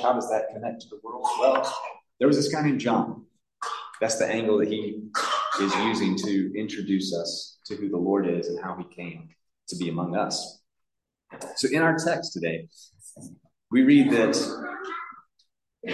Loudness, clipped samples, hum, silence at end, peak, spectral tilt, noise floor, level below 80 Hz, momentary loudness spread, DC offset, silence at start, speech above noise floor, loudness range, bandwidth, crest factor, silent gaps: -25 LUFS; under 0.1%; none; 0 s; -8 dBFS; -4.5 dB/octave; -82 dBFS; -70 dBFS; 17 LU; under 0.1%; 0 s; 57 dB; 5 LU; 12.5 kHz; 18 dB; none